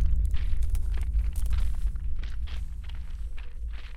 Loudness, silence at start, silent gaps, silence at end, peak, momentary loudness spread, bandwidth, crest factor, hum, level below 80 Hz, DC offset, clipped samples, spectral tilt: -34 LUFS; 0 s; none; 0 s; -12 dBFS; 10 LU; 11.5 kHz; 14 dB; none; -28 dBFS; under 0.1%; under 0.1%; -6 dB/octave